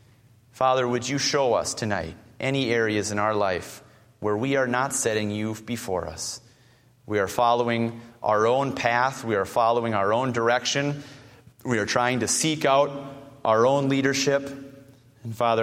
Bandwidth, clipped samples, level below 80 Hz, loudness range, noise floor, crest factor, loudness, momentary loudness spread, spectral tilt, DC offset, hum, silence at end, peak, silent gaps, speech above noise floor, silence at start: 16 kHz; under 0.1%; -58 dBFS; 4 LU; -57 dBFS; 20 dB; -24 LUFS; 11 LU; -4 dB/octave; under 0.1%; none; 0 s; -4 dBFS; none; 34 dB; 0.55 s